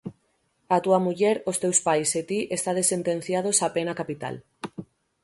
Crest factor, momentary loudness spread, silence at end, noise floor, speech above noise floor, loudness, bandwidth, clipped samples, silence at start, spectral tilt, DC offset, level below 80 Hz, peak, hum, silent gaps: 20 dB; 17 LU; 0.4 s; -70 dBFS; 45 dB; -24 LUFS; 12 kHz; under 0.1%; 0.05 s; -3.5 dB/octave; under 0.1%; -68 dBFS; -6 dBFS; none; none